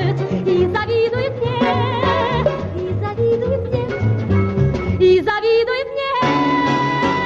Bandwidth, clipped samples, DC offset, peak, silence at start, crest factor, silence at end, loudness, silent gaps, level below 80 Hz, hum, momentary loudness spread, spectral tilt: 7.6 kHz; under 0.1%; under 0.1%; -4 dBFS; 0 s; 14 dB; 0 s; -18 LUFS; none; -38 dBFS; none; 5 LU; -7.5 dB/octave